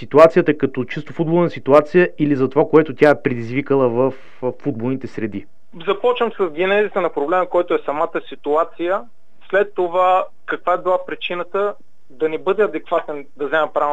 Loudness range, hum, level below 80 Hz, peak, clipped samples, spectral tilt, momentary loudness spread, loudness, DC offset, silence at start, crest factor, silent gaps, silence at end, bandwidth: 5 LU; none; -58 dBFS; 0 dBFS; under 0.1%; -7.5 dB/octave; 11 LU; -18 LUFS; 2%; 0 s; 18 dB; none; 0 s; 9 kHz